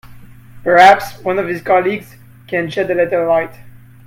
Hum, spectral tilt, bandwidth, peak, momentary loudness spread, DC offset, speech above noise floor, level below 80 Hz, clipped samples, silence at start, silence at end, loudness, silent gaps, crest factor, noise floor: none; -5 dB/octave; 16.5 kHz; 0 dBFS; 14 LU; under 0.1%; 23 dB; -50 dBFS; 0.2%; 0.1 s; 0.3 s; -14 LUFS; none; 16 dB; -37 dBFS